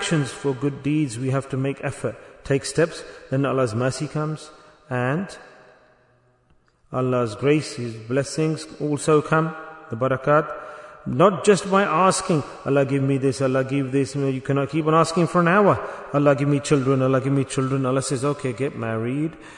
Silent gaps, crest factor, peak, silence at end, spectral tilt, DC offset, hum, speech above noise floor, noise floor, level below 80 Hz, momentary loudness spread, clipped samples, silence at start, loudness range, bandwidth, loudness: none; 18 dB; -4 dBFS; 0 s; -6 dB/octave; under 0.1%; none; 39 dB; -60 dBFS; -56 dBFS; 11 LU; under 0.1%; 0 s; 7 LU; 11 kHz; -22 LUFS